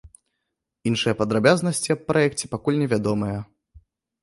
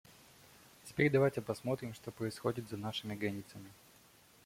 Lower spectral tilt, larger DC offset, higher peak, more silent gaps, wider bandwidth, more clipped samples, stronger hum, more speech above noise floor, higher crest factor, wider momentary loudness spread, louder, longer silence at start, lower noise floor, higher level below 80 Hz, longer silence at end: about the same, -5 dB/octave vs -6 dB/octave; neither; first, -2 dBFS vs -16 dBFS; neither; second, 11.5 kHz vs 16.5 kHz; neither; neither; first, 59 dB vs 27 dB; about the same, 20 dB vs 22 dB; second, 9 LU vs 21 LU; first, -22 LUFS vs -37 LUFS; second, 0.05 s vs 0.85 s; first, -80 dBFS vs -64 dBFS; first, -54 dBFS vs -70 dBFS; about the same, 0.8 s vs 0.7 s